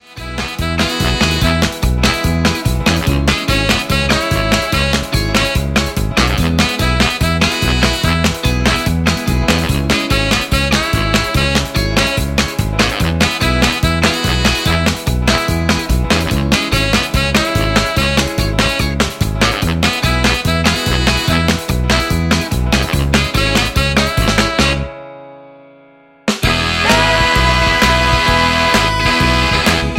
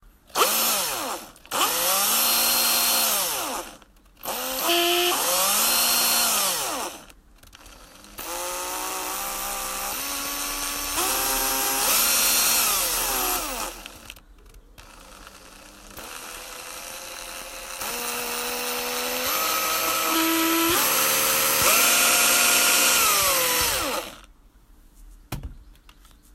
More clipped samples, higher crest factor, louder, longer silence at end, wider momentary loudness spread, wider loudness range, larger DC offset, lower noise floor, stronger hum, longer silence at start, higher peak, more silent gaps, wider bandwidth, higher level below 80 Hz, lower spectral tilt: neither; second, 14 dB vs 20 dB; first, -14 LUFS vs -21 LUFS; second, 0 s vs 0.45 s; second, 4 LU vs 18 LU; second, 2 LU vs 14 LU; neither; second, -45 dBFS vs -53 dBFS; neither; second, 0.1 s vs 0.35 s; first, 0 dBFS vs -6 dBFS; neither; about the same, 17 kHz vs 16 kHz; first, -22 dBFS vs -50 dBFS; first, -4 dB/octave vs 0 dB/octave